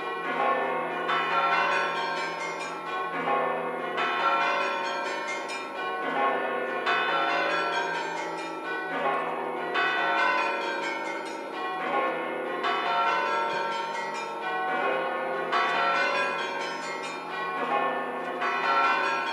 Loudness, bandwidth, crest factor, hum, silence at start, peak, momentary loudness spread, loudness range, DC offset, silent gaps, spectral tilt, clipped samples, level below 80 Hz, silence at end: -27 LUFS; 15.5 kHz; 16 dB; none; 0 s; -12 dBFS; 8 LU; 1 LU; under 0.1%; none; -3 dB/octave; under 0.1%; -86 dBFS; 0 s